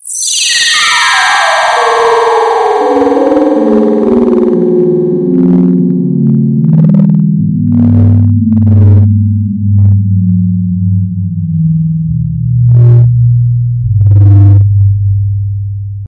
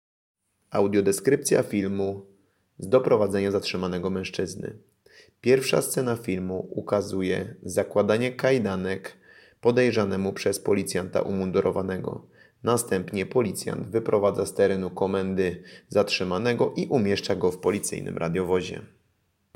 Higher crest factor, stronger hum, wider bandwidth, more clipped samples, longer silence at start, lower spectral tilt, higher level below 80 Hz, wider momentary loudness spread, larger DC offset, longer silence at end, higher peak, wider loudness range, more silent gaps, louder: second, 8 dB vs 18 dB; neither; second, 11.5 kHz vs 16.5 kHz; neither; second, 0.05 s vs 0.7 s; about the same, -5.5 dB/octave vs -5 dB/octave; first, -32 dBFS vs -62 dBFS; about the same, 7 LU vs 9 LU; neither; second, 0 s vs 0.7 s; first, 0 dBFS vs -8 dBFS; about the same, 2 LU vs 2 LU; neither; first, -8 LUFS vs -25 LUFS